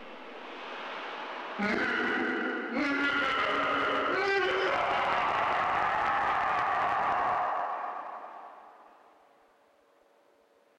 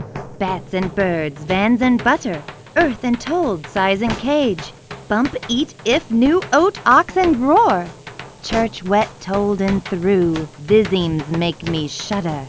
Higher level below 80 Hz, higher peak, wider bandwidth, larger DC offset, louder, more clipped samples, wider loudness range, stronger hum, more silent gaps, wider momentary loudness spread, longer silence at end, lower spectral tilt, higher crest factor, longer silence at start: second, -64 dBFS vs -42 dBFS; second, -12 dBFS vs 0 dBFS; first, 11 kHz vs 8 kHz; neither; second, -29 LUFS vs -18 LUFS; neither; first, 7 LU vs 3 LU; neither; neither; first, 14 LU vs 10 LU; first, 1.95 s vs 0 s; about the same, -4.5 dB/octave vs -5.5 dB/octave; about the same, 20 dB vs 18 dB; about the same, 0 s vs 0 s